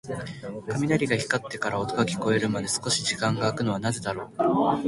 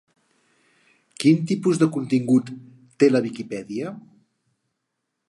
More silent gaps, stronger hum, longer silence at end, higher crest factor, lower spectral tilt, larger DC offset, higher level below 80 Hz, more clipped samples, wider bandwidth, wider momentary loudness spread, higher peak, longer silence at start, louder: neither; neither; second, 0 s vs 1.3 s; about the same, 18 dB vs 20 dB; second, -4.5 dB/octave vs -6.5 dB/octave; neither; first, -56 dBFS vs -72 dBFS; neither; about the same, 12 kHz vs 11.5 kHz; second, 8 LU vs 16 LU; second, -8 dBFS vs -4 dBFS; second, 0.05 s vs 1.2 s; second, -26 LUFS vs -21 LUFS